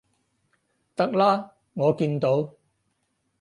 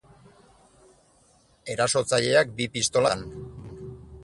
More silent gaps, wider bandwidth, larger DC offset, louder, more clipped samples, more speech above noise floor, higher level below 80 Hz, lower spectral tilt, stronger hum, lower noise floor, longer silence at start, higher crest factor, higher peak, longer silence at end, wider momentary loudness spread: neither; about the same, 11 kHz vs 11.5 kHz; neither; about the same, -24 LUFS vs -24 LUFS; neither; first, 51 dB vs 37 dB; second, -70 dBFS vs -54 dBFS; first, -8 dB/octave vs -3 dB/octave; neither; first, -74 dBFS vs -61 dBFS; second, 1 s vs 1.65 s; about the same, 18 dB vs 22 dB; about the same, -8 dBFS vs -6 dBFS; first, 0.9 s vs 0 s; second, 15 LU vs 20 LU